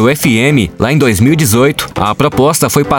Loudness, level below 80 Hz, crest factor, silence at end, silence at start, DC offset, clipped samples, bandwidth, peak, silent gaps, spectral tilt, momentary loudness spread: -10 LUFS; -36 dBFS; 10 dB; 0 s; 0 s; under 0.1%; under 0.1%; over 20 kHz; 0 dBFS; none; -5 dB/octave; 3 LU